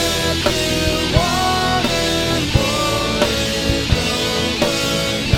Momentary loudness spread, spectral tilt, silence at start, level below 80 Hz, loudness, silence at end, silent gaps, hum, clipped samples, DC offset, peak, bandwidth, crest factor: 1 LU; -4 dB/octave; 0 s; -30 dBFS; -17 LUFS; 0 s; none; none; under 0.1%; under 0.1%; 0 dBFS; 19 kHz; 18 dB